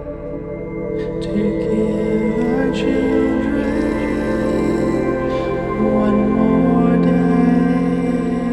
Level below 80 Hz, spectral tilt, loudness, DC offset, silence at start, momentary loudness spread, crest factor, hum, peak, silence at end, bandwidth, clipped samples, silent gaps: -34 dBFS; -8.5 dB/octave; -17 LUFS; under 0.1%; 0 s; 9 LU; 12 dB; none; -4 dBFS; 0 s; 11.5 kHz; under 0.1%; none